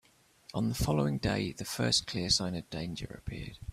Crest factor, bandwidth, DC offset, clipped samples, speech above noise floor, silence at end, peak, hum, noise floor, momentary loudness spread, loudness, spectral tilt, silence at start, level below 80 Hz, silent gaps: 20 dB; 16 kHz; under 0.1%; under 0.1%; 26 dB; 0 s; -14 dBFS; none; -58 dBFS; 13 LU; -32 LUFS; -4 dB/octave; 0.55 s; -48 dBFS; none